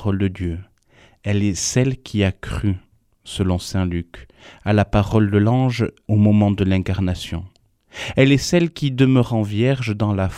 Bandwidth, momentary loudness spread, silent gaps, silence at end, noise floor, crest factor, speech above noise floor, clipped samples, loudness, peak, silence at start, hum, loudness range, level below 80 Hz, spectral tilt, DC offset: 13.5 kHz; 14 LU; none; 0 s; -53 dBFS; 18 dB; 34 dB; under 0.1%; -19 LUFS; 0 dBFS; 0 s; none; 4 LU; -40 dBFS; -6 dB/octave; under 0.1%